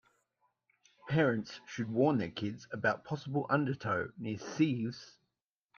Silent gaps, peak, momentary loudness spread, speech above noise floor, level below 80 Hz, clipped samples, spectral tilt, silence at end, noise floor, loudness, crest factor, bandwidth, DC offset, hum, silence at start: none; -16 dBFS; 10 LU; 54 dB; -72 dBFS; under 0.1%; -7 dB/octave; 0.7 s; -87 dBFS; -34 LUFS; 20 dB; 7 kHz; under 0.1%; none; 1.05 s